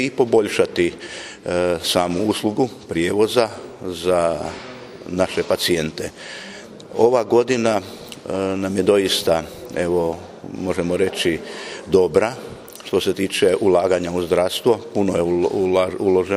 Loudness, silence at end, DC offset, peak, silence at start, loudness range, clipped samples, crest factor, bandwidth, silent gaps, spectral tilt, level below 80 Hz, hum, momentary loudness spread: -20 LUFS; 0 s; under 0.1%; 0 dBFS; 0 s; 3 LU; under 0.1%; 20 dB; 15.5 kHz; none; -4.5 dB/octave; -50 dBFS; none; 15 LU